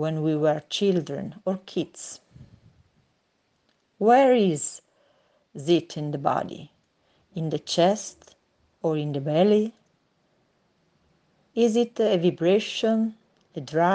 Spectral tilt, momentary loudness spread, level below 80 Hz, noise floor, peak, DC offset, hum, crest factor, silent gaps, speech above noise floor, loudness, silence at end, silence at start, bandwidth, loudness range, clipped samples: -5.5 dB/octave; 18 LU; -70 dBFS; -71 dBFS; -8 dBFS; under 0.1%; none; 18 dB; none; 47 dB; -24 LUFS; 0 s; 0 s; 9.8 kHz; 5 LU; under 0.1%